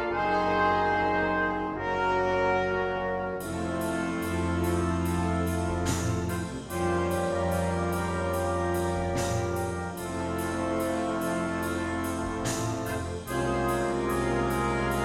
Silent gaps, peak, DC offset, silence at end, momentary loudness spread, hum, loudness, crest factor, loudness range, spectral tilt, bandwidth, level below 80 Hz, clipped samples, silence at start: none; -14 dBFS; under 0.1%; 0 s; 6 LU; none; -29 LUFS; 14 dB; 3 LU; -5.5 dB/octave; 16 kHz; -44 dBFS; under 0.1%; 0 s